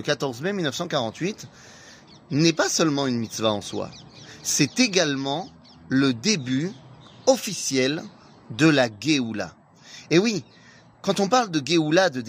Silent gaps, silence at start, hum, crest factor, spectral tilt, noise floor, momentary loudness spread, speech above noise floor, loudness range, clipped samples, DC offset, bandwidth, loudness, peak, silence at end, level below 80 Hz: none; 0 s; none; 20 dB; -4 dB/octave; -48 dBFS; 15 LU; 25 dB; 2 LU; under 0.1%; under 0.1%; 15.5 kHz; -23 LUFS; -4 dBFS; 0 s; -64 dBFS